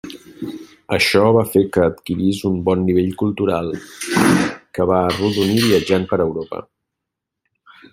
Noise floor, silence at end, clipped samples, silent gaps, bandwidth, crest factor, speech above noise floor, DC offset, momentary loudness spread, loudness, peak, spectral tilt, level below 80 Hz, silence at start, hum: -81 dBFS; 1.3 s; under 0.1%; none; 16.5 kHz; 16 dB; 64 dB; under 0.1%; 16 LU; -17 LUFS; -2 dBFS; -5.5 dB/octave; -52 dBFS; 0.05 s; none